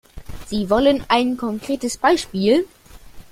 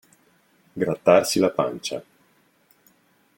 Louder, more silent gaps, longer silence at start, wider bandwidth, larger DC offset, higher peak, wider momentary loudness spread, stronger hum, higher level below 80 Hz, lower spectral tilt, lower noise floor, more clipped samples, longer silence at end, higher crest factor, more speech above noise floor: about the same, -19 LUFS vs -21 LUFS; neither; second, 0.15 s vs 0.75 s; about the same, 16 kHz vs 17 kHz; neither; about the same, -2 dBFS vs -2 dBFS; second, 13 LU vs 16 LU; neither; first, -42 dBFS vs -64 dBFS; about the same, -4.5 dB/octave vs -4.5 dB/octave; second, -40 dBFS vs -62 dBFS; neither; second, 0.1 s vs 1.35 s; second, 18 dB vs 24 dB; second, 21 dB vs 41 dB